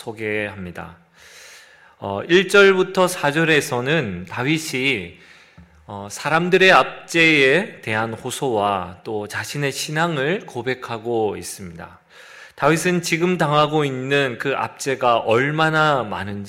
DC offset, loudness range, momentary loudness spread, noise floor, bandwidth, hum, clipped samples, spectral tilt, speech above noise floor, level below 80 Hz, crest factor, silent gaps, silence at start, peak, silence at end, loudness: under 0.1%; 6 LU; 16 LU; -48 dBFS; 16 kHz; none; under 0.1%; -4.5 dB/octave; 29 dB; -58 dBFS; 20 dB; none; 0 s; 0 dBFS; 0 s; -19 LUFS